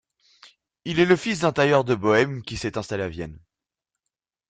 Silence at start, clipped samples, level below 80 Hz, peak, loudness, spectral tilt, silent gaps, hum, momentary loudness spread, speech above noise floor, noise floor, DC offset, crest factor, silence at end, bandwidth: 0.85 s; under 0.1%; -52 dBFS; -4 dBFS; -22 LUFS; -5.5 dB/octave; none; none; 13 LU; 64 dB; -86 dBFS; under 0.1%; 22 dB; 1.1 s; 9.2 kHz